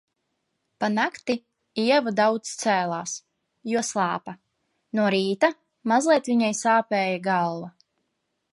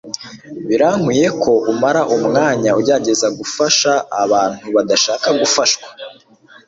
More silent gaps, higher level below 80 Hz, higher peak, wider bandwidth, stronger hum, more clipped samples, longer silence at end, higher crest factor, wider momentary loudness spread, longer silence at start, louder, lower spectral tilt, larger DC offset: neither; second, -76 dBFS vs -56 dBFS; second, -6 dBFS vs 0 dBFS; first, 11.5 kHz vs 8 kHz; neither; neither; first, 0.85 s vs 0.55 s; about the same, 18 dB vs 14 dB; about the same, 13 LU vs 15 LU; first, 0.8 s vs 0.05 s; second, -24 LUFS vs -14 LUFS; about the same, -4 dB/octave vs -3 dB/octave; neither